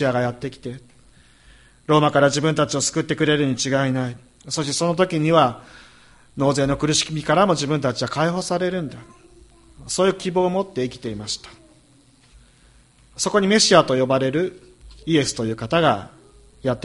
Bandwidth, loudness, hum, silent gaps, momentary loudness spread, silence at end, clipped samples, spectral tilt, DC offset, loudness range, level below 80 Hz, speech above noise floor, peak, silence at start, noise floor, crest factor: 11.5 kHz; -20 LUFS; none; none; 13 LU; 0.05 s; under 0.1%; -4.5 dB/octave; under 0.1%; 6 LU; -50 dBFS; 34 dB; 0 dBFS; 0 s; -54 dBFS; 20 dB